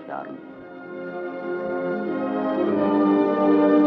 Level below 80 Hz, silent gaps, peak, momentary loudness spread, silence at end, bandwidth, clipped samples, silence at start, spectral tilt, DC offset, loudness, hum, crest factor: -74 dBFS; none; -8 dBFS; 18 LU; 0 s; 5 kHz; under 0.1%; 0 s; -9.5 dB/octave; under 0.1%; -22 LUFS; none; 14 dB